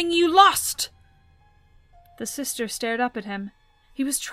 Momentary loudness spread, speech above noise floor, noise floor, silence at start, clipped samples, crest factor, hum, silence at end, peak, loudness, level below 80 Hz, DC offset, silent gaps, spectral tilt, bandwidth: 19 LU; 34 dB; -57 dBFS; 0 s; under 0.1%; 24 dB; none; 0 s; 0 dBFS; -22 LUFS; -56 dBFS; under 0.1%; none; -2 dB/octave; 16 kHz